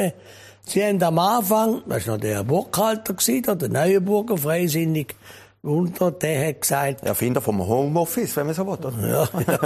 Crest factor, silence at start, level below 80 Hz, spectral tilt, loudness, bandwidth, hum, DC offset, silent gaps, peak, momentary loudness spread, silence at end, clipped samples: 16 dB; 0 s; -56 dBFS; -5 dB/octave; -22 LUFS; 15.5 kHz; none; under 0.1%; none; -4 dBFS; 7 LU; 0 s; under 0.1%